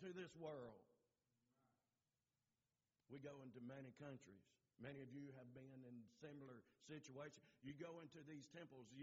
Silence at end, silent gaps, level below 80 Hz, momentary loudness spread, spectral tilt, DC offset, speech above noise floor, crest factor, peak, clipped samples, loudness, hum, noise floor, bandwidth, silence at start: 0 s; none; under -90 dBFS; 7 LU; -5.5 dB/octave; under 0.1%; over 31 dB; 18 dB; -42 dBFS; under 0.1%; -60 LUFS; none; under -90 dBFS; 7.4 kHz; 0 s